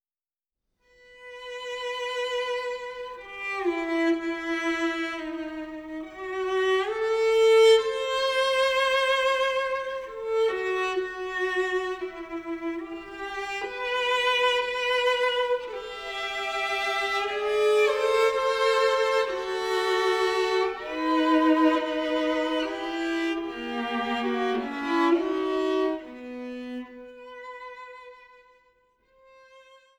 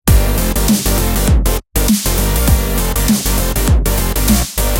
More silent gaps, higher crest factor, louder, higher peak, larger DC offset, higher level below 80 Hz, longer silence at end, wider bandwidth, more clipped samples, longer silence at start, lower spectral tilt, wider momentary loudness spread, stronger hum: neither; first, 18 dB vs 12 dB; second, -26 LUFS vs -14 LUFS; second, -10 dBFS vs 0 dBFS; neither; second, -60 dBFS vs -16 dBFS; first, 0.4 s vs 0 s; about the same, 17.5 kHz vs 17.5 kHz; neither; first, 1.1 s vs 0.05 s; second, -2.5 dB/octave vs -4.5 dB/octave; first, 15 LU vs 2 LU; neither